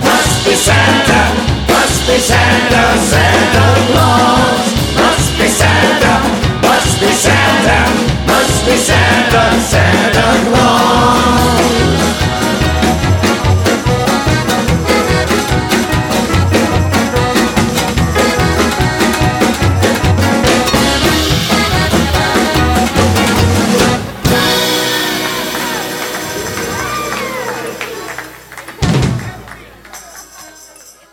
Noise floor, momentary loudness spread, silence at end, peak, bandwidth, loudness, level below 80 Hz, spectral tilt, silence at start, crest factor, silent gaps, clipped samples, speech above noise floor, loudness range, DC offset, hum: -38 dBFS; 9 LU; 0.2 s; 0 dBFS; 18.5 kHz; -11 LUFS; -24 dBFS; -4 dB/octave; 0 s; 12 dB; none; under 0.1%; 30 dB; 9 LU; under 0.1%; none